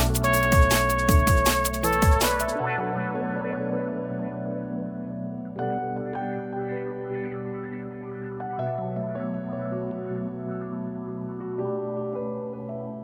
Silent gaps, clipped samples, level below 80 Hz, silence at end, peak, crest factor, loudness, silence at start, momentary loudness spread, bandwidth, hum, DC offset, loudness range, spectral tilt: none; under 0.1%; -34 dBFS; 0 s; -6 dBFS; 20 dB; -27 LUFS; 0 s; 13 LU; over 20 kHz; none; under 0.1%; 10 LU; -5 dB/octave